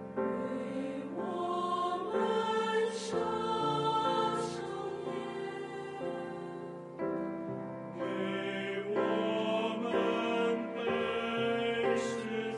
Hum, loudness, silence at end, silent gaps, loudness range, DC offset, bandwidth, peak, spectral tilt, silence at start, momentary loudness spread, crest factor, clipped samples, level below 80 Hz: none; -34 LUFS; 0 s; none; 7 LU; under 0.1%; 11.5 kHz; -18 dBFS; -5 dB/octave; 0 s; 9 LU; 16 dB; under 0.1%; -70 dBFS